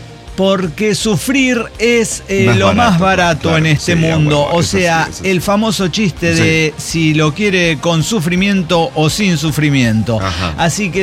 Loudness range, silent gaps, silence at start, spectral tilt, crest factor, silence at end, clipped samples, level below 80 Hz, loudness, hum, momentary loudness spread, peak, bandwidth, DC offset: 1 LU; none; 0 s; -5 dB/octave; 12 dB; 0 s; under 0.1%; -34 dBFS; -13 LUFS; none; 4 LU; -2 dBFS; 16 kHz; under 0.1%